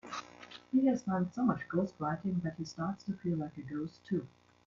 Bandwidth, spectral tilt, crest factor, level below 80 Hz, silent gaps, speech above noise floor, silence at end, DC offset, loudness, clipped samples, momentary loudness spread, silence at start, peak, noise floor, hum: 7.4 kHz; -7.5 dB/octave; 18 dB; -70 dBFS; none; 19 dB; 0.4 s; under 0.1%; -35 LUFS; under 0.1%; 13 LU; 0.05 s; -18 dBFS; -54 dBFS; none